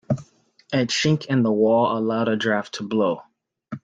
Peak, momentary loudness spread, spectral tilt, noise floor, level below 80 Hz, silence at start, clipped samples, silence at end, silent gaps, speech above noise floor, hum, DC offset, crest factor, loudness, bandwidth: -6 dBFS; 10 LU; -5.5 dB/octave; -55 dBFS; -62 dBFS; 0.1 s; under 0.1%; 0.05 s; none; 34 dB; none; under 0.1%; 16 dB; -22 LUFS; 9.2 kHz